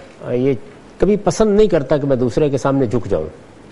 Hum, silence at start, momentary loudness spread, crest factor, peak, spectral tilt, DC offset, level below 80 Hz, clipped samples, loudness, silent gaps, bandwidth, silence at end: none; 0 s; 9 LU; 16 dB; 0 dBFS; -7 dB/octave; under 0.1%; -34 dBFS; under 0.1%; -17 LUFS; none; 11.5 kHz; 0.3 s